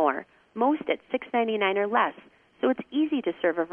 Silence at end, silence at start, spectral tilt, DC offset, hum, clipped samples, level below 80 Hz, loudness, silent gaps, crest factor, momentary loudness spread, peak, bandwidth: 0 s; 0 s; -7.5 dB/octave; under 0.1%; none; under 0.1%; -72 dBFS; -27 LUFS; none; 18 dB; 5 LU; -10 dBFS; 3.6 kHz